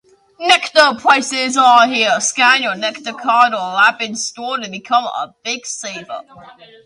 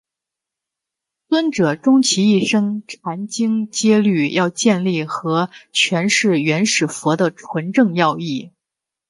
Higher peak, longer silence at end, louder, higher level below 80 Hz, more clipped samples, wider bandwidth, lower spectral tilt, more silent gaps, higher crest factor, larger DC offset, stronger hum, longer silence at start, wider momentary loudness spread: about the same, 0 dBFS vs -2 dBFS; second, 0.35 s vs 0.6 s; first, -14 LUFS vs -17 LUFS; about the same, -68 dBFS vs -66 dBFS; neither; about the same, 11.5 kHz vs 11.5 kHz; second, -1 dB/octave vs -4.5 dB/octave; neither; about the same, 16 dB vs 16 dB; neither; neither; second, 0.4 s vs 1.3 s; first, 14 LU vs 10 LU